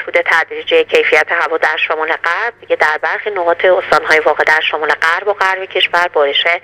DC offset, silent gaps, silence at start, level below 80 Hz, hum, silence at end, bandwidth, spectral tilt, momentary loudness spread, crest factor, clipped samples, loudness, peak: under 0.1%; none; 0 s; -56 dBFS; none; 0.05 s; 15 kHz; -2 dB/octave; 5 LU; 14 dB; 0.1%; -12 LUFS; 0 dBFS